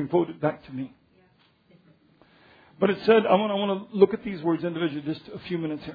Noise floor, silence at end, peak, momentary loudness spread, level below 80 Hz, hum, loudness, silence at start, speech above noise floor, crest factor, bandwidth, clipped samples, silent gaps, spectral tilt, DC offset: -62 dBFS; 0 s; -4 dBFS; 16 LU; -64 dBFS; none; -25 LUFS; 0 s; 37 dB; 22 dB; 5 kHz; under 0.1%; none; -9 dB/octave; under 0.1%